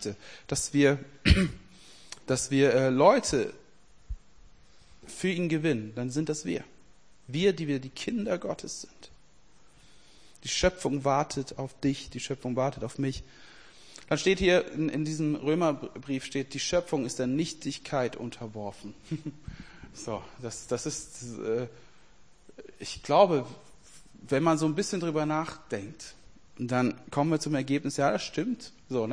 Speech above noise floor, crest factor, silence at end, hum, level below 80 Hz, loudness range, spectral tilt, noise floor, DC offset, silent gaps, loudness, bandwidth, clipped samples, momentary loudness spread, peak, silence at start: 33 dB; 24 dB; 0 s; none; -46 dBFS; 9 LU; -5 dB/octave; -61 dBFS; 0.2%; none; -29 LUFS; 10.5 kHz; under 0.1%; 18 LU; -6 dBFS; 0 s